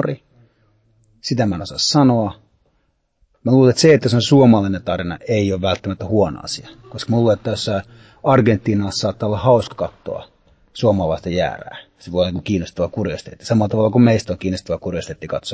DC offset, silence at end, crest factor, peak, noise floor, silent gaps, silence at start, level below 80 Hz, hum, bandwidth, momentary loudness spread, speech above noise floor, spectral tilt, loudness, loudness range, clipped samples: under 0.1%; 0 s; 16 dB; -2 dBFS; -65 dBFS; none; 0 s; -42 dBFS; none; 8 kHz; 15 LU; 48 dB; -6 dB/octave; -18 LUFS; 6 LU; under 0.1%